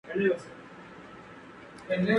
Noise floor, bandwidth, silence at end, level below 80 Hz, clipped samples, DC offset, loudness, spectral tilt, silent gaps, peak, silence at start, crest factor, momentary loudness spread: -48 dBFS; 11 kHz; 0 s; -66 dBFS; under 0.1%; under 0.1%; -30 LUFS; -7 dB/octave; none; -12 dBFS; 0.05 s; 20 dB; 19 LU